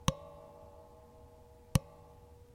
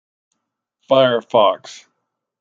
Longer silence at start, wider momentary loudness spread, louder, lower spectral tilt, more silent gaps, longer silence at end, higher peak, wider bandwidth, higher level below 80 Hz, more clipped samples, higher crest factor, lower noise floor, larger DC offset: second, 0.05 s vs 0.9 s; first, 22 LU vs 4 LU; second, -37 LUFS vs -16 LUFS; about the same, -5 dB/octave vs -5 dB/octave; neither; second, 0.2 s vs 0.65 s; second, -12 dBFS vs -2 dBFS; first, 16.5 kHz vs 7.6 kHz; first, -50 dBFS vs -70 dBFS; neither; first, 28 dB vs 18 dB; second, -58 dBFS vs -77 dBFS; neither